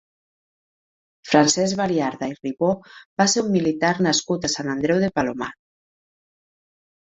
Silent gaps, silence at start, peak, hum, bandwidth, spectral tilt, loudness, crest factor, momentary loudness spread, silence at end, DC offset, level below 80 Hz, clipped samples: 3.06-3.17 s; 1.25 s; -2 dBFS; none; 8.4 kHz; -4 dB/octave; -21 LUFS; 22 dB; 11 LU; 1.5 s; under 0.1%; -58 dBFS; under 0.1%